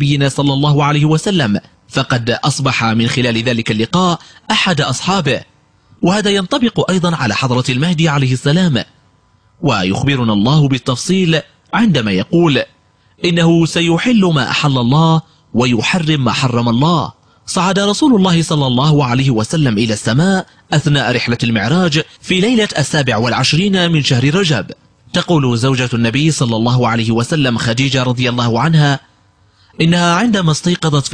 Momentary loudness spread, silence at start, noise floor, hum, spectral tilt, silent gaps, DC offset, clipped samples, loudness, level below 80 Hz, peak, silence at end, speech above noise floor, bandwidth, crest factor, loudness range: 5 LU; 0 s; -53 dBFS; none; -5.5 dB/octave; none; under 0.1%; under 0.1%; -13 LUFS; -44 dBFS; -2 dBFS; 0 s; 40 dB; 10.5 kHz; 12 dB; 2 LU